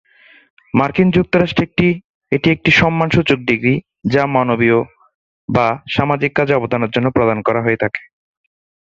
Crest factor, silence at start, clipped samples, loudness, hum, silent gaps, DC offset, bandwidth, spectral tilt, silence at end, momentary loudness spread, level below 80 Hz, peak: 16 dB; 0.75 s; under 0.1%; -15 LUFS; none; 2.04-2.21 s, 5.15-5.48 s; under 0.1%; 7.8 kHz; -7 dB/octave; 0.95 s; 7 LU; -44 dBFS; 0 dBFS